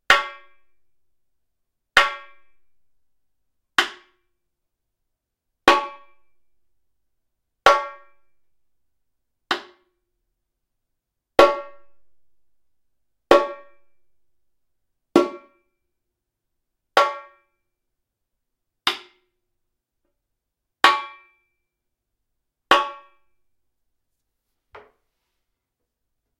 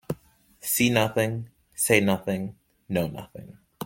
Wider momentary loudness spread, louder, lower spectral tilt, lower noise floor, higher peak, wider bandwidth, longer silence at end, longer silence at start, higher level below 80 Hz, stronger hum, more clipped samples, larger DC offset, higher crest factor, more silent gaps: second, 16 LU vs 19 LU; first, -20 LUFS vs -25 LUFS; second, -2.5 dB/octave vs -4 dB/octave; first, -81 dBFS vs -56 dBFS; about the same, 0 dBFS vs -2 dBFS; about the same, 16 kHz vs 17 kHz; first, 3.45 s vs 0 s; about the same, 0.1 s vs 0.1 s; about the same, -58 dBFS vs -58 dBFS; neither; neither; neither; about the same, 26 dB vs 24 dB; neither